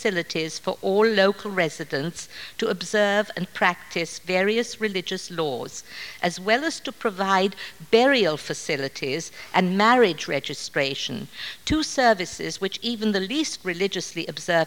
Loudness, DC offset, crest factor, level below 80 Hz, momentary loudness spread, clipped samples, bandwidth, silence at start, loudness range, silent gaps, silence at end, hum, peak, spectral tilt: -24 LUFS; 0.3%; 20 dB; -54 dBFS; 11 LU; under 0.1%; 18 kHz; 0 s; 4 LU; none; 0 s; none; -4 dBFS; -4 dB/octave